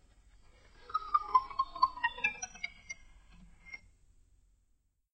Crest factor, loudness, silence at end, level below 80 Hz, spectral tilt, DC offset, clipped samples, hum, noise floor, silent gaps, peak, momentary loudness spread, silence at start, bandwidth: 24 dB; -33 LUFS; 1.35 s; -60 dBFS; -0.5 dB/octave; under 0.1%; under 0.1%; none; -74 dBFS; none; -14 dBFS; 20 LU; 0.8 s; 8.6 kHz